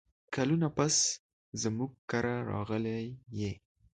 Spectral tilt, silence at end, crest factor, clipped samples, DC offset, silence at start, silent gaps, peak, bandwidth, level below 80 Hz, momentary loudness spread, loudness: -4 dB/octave; 0.35 s; 20 dB; under 0.1%; under 0.1%; 0.3 s; 1.19-1.52 s, 1.98-2.08 s; -14 dBFS; 9.4 kHz; -60 dBFS; 13 LU; -33 LUFS